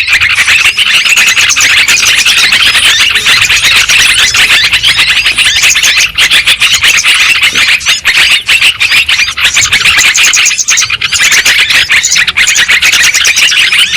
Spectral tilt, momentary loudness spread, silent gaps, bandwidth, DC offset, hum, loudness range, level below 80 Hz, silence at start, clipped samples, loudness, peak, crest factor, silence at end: 2 dB/octave; 2 LU; none; over 20 kHz; under 0.1%; none; 1 LU; -36 dBFS; 0 s; 5%; -3 LUFS; 0 dBFS; 6 dB; 0 s